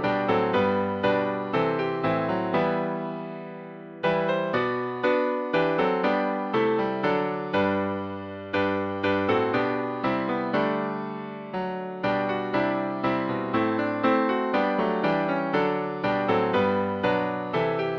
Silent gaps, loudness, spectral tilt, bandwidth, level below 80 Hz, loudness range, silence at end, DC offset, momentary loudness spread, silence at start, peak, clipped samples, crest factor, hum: none; -26 LUFS; -8 dB/octave; 7 kHz; -62 dBFS; 3 LU; 0 s; under 0.1%; 8 LU; 0 s; -10 dBFS; under 0.1%; 16 dB; none